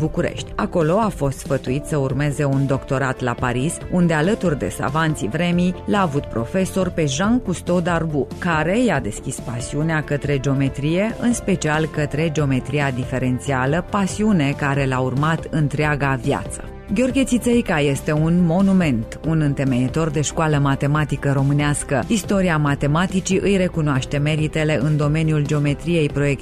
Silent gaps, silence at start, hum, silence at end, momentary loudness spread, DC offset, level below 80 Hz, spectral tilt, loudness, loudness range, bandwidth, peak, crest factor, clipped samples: none; 0 s; none; 0 s; 5 LU; under 0.1%; -36 dBFS; -6 dB/octave; -20 LUFS; 2 LU; 14 kHz; -6 dBFS; 12 dB; under 0.1%